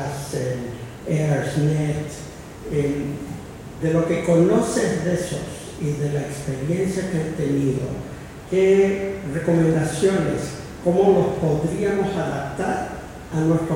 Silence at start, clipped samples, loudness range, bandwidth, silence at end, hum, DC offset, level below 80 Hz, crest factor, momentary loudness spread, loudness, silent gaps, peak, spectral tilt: 0 s; under 0.1%; 5 LU; 16 kHz; 0 s; none; under 0.1%; -44 dBFS; 16 dB; 15 LU; -22 LUFS; none; -4 dBFS; -6.5 dB/octave